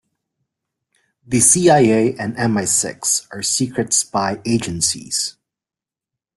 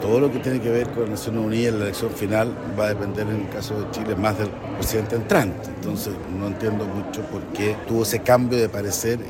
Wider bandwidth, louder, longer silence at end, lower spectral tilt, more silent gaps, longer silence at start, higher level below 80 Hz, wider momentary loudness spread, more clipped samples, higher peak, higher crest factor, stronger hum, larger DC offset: second, 12.5 kHz vs 16.5 kHz; first, -16 LUFS vs -23 LUFS; first, 1.05 s vs 0 s; second, -3.5 dB/octave vs -5.5 dB/octave; neither; first, 1.3 s vs 0 s; second, -54 dBFS vs -46 dBFS; about the same, 10 LU vs 8 LU; neither; first, 0 dBFS vs -4 dBFS; about the same, 20 dB vs 18 dB; neither; neither